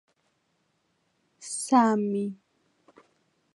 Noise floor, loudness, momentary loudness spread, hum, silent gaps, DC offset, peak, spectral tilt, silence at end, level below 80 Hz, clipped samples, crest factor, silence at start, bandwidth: -73 dBFS; -26 LUFS; 14 LU; none; none; under 0.1%; -8 dBFS; -5 dB/octave; 1.2 s; -82 dBFS; under 0.1%; 22 dB; 1.4 s; 11.5 kHz